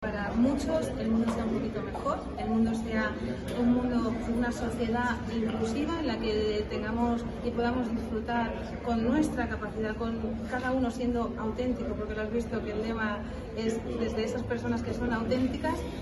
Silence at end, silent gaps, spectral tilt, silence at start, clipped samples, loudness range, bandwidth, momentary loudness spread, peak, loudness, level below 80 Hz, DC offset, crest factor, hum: 0 s; none; -6.5 dB/octave; 0 s; under 0.1%; 2 LU; 12 kHz; 6 LU; -14 dBFS; -31 LUFS; -44 dBFS; under 0.1%; 16 dB; none